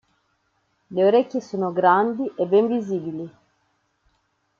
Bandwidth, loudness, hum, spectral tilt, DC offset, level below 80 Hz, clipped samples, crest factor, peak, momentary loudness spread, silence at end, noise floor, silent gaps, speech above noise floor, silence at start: 7 kHz; -21 LUFS; none; -7.5 dB/octave; under 0.1%; -72 dBFS; under 0.1%; 18 dB; -4 dBFS; 13 LU; 1.3 s; -69 dBFS; none; 49 dB; 0.9 s